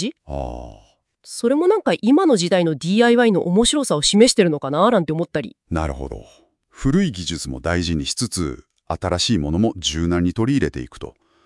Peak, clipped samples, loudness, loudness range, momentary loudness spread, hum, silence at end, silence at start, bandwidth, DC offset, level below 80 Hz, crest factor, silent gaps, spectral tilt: -2 dBFS; under 0.1%; -19 LUFS; 8 LU; 17 LU; none; 0.35 s; 0 s; 12 kHz; under 0.1%; -40 dBFS; 18 dB; none; -4.5 dB/octave